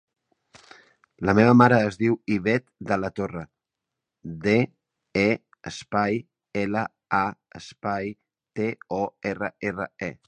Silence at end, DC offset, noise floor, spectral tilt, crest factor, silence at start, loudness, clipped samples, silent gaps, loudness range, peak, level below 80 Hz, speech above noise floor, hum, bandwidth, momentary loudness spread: 0.15 s; under 0.1%; -85 dBFS; -7 dB/octave; 24 dB; 1.2 s; -24 LUFS; under 0.1%; none; 7 LU; -2 dBFS; -56 dBFS; 62 dB; none; 9.2 kHz; 18 LU